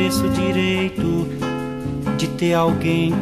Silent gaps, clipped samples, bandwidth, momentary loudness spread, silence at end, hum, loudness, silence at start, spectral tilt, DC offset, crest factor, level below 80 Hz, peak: none; under 0.1%; 15.5 kHz; 7 LU; 0 s; none; -20 LUFS; 0 s; -6 dB/octave; under 0.1%; 16 dB; -42 dBFS; -4 dBFS